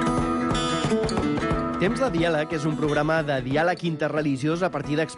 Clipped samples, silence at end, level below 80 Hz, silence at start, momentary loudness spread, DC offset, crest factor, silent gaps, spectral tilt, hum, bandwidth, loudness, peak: under 0.1%; 0 s; -42 dBFS; 0 s; 3 LU; under 0.1%; 12 dB; none; -6 dB/octave; none; 11.5 kHz; -24 LUFS; -12 dBFS